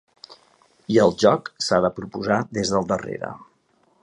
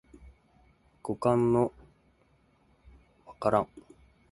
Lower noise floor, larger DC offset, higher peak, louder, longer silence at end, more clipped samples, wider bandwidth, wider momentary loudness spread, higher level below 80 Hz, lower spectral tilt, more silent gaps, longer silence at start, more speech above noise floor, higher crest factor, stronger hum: about the same, -63 dBFS vs -66 dBFS; neither; first, -2 dBFS vs -10 dBFS; first, -22 LUFS vs -29 LUFS; about the same, 0.6 s vs 0.5 s; neither; about the same, 10.5 kHz vs 11.5 kHz; about the same, 15 LU vs 14 LU; about the same, -54 dBFS vs -58 dBFS; second, -5 dB/octave vs -8.5 dB/octave; neither; second, 0.3 s vs 1.05 s; about the same, 42 dB vs 40 dB; about the same, 20 dB vs 22 dB; neither